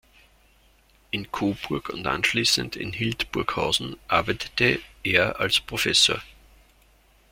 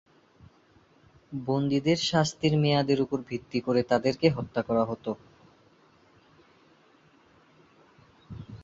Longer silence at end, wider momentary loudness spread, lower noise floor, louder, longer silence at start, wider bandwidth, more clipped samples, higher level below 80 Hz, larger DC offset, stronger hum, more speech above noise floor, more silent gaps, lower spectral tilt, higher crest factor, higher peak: first, 1 s vs 0 s; second, 11 LU vs 15 LU; about the same, -59 dBFS vs -61 dBFS; first, -23 LUFS vs -27 LUFS; second, 1.15 s vs 1.3 s; first, 16.5 kHz vs 7.8 kHz; neither; first, -50 dBFS vs -60 dBFS; neither; neither; about the same, 34 dB vs 35 dB; neither; second, -3 dB/octave vs -6 dB/octave; about the same, 22 dB vs 22 dB; about the same, -4 dBFS vs -6 dBFS